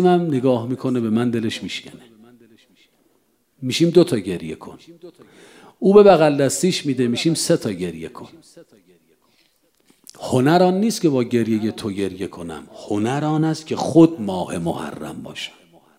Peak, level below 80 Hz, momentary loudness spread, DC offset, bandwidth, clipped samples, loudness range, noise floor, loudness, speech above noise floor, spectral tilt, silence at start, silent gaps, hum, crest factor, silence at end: -2 dBFS; -60 dBFS; 18 LU; under 0.1%; 16 kHz; under 0.1%; 7 LU; -64 dBFS; -19 LUFS; 45 dB; -5.5 dB/octave; 0 s; none; none; 18 dB; 0.5 s